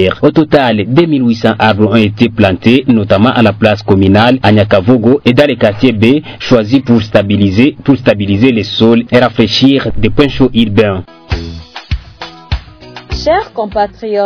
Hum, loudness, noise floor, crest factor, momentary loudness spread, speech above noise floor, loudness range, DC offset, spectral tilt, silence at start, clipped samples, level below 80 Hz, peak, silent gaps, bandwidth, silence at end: none; -9 LUFS; -31 dBFS; 10 dB; 13 LU; 23 dB; 6 LU; under 0.1%; -7.5 dB/octave; 0 s; 3%; -30 dBFS; 0 dBFS; none; 5.4 kHz; 0 s